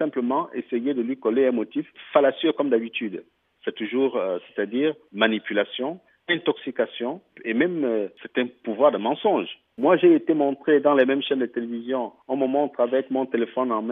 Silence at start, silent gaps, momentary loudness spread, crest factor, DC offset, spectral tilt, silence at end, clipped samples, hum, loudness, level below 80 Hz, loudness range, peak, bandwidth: 0 s; none; 11 LU; 18 dB; under 0.1%; -8.5 dB/octave; 0 s; under 0.1%; none; -24 LUFS; -80 dBFS; 5 LU; -4 dBFS; 3.9 kHz